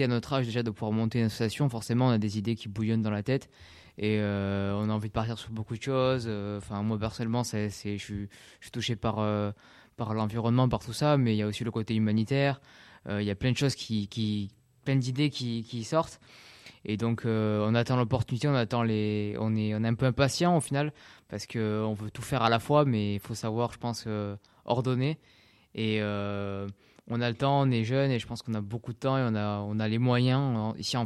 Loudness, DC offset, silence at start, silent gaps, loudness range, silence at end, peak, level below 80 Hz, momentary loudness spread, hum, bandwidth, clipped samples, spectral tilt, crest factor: -29 LUFS; under 0.1%; 0 s; none; 4 LU; 0 s; -10 dBFS; -58 dBFS; 10 LU; none; 13 kHz; under 0.1%; -6.5 dB/octave; 20 dB